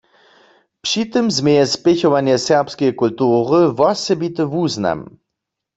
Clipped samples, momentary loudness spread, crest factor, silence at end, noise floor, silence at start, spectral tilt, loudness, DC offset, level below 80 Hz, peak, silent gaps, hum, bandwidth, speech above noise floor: under 0.1%; 6 LU; 16 dB; 0.7 s; -80 dBFS; 0.85 s; -5 dB/octave; -16 LUFS; under 0.1%; -56 dBFS; -2 dBFS; none; none; 8 kHz; 64 dB